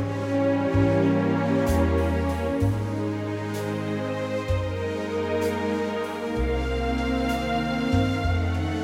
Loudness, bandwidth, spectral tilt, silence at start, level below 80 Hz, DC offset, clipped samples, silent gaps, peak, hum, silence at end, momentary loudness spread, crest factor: -25 LUFS; 16.5 kHz; -7 dB/octave; 0 s; -36 dBFS; under 0.1%; under 0.1%; none; -10 dBFS; none; 0 s; 6 LU; 14 dB